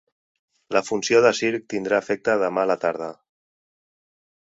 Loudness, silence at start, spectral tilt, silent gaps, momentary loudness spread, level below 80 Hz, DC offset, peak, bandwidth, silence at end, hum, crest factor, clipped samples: -22 LUFS; 0.7 s; -4 dB/octave; none; 9 LU; -66 dBFS; under 0.1%; -2 dBFS; 8 kHz; 1.45 s; none; 22 dB; under 0.1%